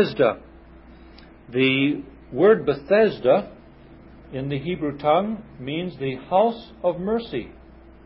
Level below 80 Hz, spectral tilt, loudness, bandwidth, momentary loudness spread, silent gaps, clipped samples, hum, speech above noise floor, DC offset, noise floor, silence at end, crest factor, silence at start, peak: -50 dBFS; -10.5 dB/octave; -22 LUFS; 5.8 kHz; 14 LU; none; under 0.1%; none; 25 dB; under 0.1%; -46 dBFS; 0.55 s; 18 dB; 0 s; -6 dBFS